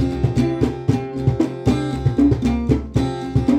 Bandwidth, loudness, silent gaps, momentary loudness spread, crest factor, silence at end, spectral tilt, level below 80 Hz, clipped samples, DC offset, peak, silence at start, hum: 10 kHz; -20 LUFS; none; 5 LU; 16 dB; 0 s; -8 dB/octave; -30 dBFS; under 0.1%; under 0.1%; -2 dBFS; 0 s; none